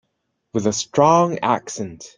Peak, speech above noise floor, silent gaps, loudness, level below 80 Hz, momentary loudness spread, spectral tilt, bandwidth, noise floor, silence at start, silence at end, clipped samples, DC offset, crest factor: -2 dBFS; 55 dB; none; -19 LUFS; -58 dBFS; 14 LU; -5 dB/octave; 10 kHz; -73 dBFS; 0.55 s; 0.1 s; under 0.1%; under 0.1%; 18 dB